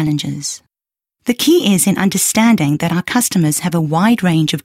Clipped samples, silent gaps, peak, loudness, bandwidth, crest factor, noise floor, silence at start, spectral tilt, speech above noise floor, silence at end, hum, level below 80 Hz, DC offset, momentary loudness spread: under 0.1%; none; -2 dBFS; -14 LUFS; 16.5 kHz; 14 dB; -89 dBFS; 0 s; -4.5 dB/octave; 75 dB; 0.05 s; none; -52 dBFS; under 0.1%; 10 LU